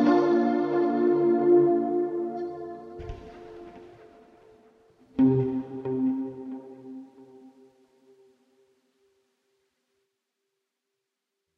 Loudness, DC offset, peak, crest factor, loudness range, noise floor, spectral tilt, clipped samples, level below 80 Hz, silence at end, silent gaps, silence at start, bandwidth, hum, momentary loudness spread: -25 LUFS; under 0.1%; -10 dBFS; 18 dB; 13 LU; -84 dBFS; -9.5 dB/octave; under 0.1%; -58 dBFS; 4.1 s; none; 0 s; 6 kHz; none; 24 LU